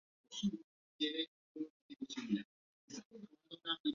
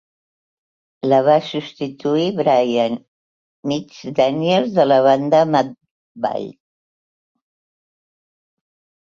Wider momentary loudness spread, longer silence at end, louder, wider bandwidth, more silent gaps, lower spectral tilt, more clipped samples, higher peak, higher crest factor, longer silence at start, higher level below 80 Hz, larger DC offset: about the same, 15 LU vs 13 LU; second, 0 s vs 2.5 s; second, -44 LUFS vs -18 LUFS; about the same, 7.4 kHz vs 7.4 kHz; first, 0.64-0.99 s, 1.28-1.55 s, 1.70-1.89 s, 2.45-2.88 s, 3.05-3.10 s, 3.80-3.84 s vs 3.08-3.63 s, 5.91-6.15 s; second, -3.5 dB/octave vs -6.5 dB/octave; neither; second, -24 dBFS vs -2 dBFS; about the same, 20 dB vs 18 dB; second, 0.3 s vs 1.05 s; second, -80 dBFS vs -66 dBFS; neither